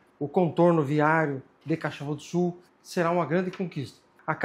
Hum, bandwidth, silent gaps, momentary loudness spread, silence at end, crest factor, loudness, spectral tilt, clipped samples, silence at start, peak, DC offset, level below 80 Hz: none; 12.5 kHz; none; 15 LU; 0 s; 20 dB; -27 LUFS; -7.5 dB/octave; under 0.1%; 0.2 s; -8 dBFS; under 0.1%; -72 dBFS